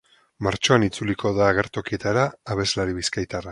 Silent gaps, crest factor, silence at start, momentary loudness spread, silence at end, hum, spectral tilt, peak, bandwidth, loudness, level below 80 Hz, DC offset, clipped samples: none; 22 dB; 0.4 s; 8 LU; 0 s; none; -4.5 dB/octave; -2 dBFS; 11.5 kHz; -23 LUFS; -46 dBFS; under 0.1%; under 0.1%